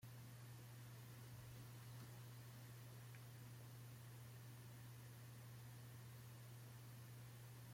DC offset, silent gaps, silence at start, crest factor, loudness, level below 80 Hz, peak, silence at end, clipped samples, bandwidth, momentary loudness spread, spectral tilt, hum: under 0.1%; none; 0 s; 12 dB; -59 LUFS; -80 dBFS; -46 dBFS; 0 s; under 0.1%; 16.5 kHz; 1 LU; -5 dB/octave; none